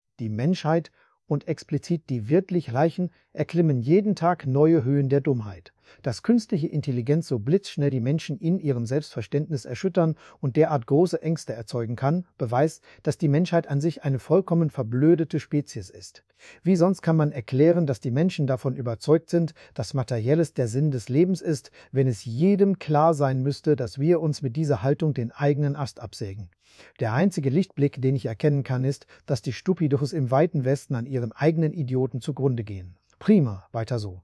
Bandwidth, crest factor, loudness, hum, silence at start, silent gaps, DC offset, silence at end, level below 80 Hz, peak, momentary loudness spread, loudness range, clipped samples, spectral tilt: 12 kHz; 18 dB; -24 LUFS; none; 0.2 s; none; under 0.1%; 0.05 s; -64 dBFS; -6 dBFS; 10 LU; 3 LU; under 0.1%; -8 dB/octave